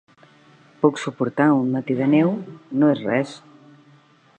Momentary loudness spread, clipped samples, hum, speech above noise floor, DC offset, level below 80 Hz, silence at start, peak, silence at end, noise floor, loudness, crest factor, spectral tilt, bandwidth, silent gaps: 11 LU; under 0.1%; none; 34 dB; under 0.1%; -70 dBFS; 0.8 s; -4 dBFS; 1 s; -54 dBFS; -21 LUFS; 18 dB; -7.5 dB/octave; 9 kHz; none